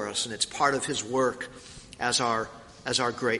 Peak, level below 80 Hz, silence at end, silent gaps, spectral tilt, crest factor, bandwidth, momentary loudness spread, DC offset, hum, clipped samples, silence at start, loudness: -8 dBFS; -60 dBFS; 0 s; none; -2.5 dB/octave; 20 dB; 11.5 kHz; 14 LU; under 0.1%; none; under 0.1%; 0 s; -27 LUFS